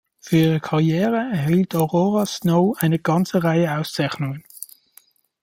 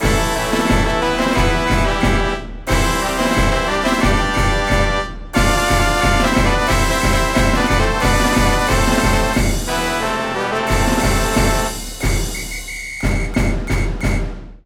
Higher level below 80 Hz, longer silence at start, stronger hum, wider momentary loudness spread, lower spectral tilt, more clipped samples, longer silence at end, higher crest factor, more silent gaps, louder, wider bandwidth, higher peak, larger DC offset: second, -58 dBFS vs -22 dBFS; first, 0.25 s vs 0 s; neither; first, 10 LU vs 6 LU; first, -6.5 dB/octave vs -4.5 dB/octave; neither; first, 0.75 s vs 0.1 s; about the same, 18 dB vs 14 dB; neither; second, -20 LUFS vs -17 LUFS; about the same, 16.5 kHz vs 17 kHz; about the same, -2 dBFS vs -2 dBFS; neither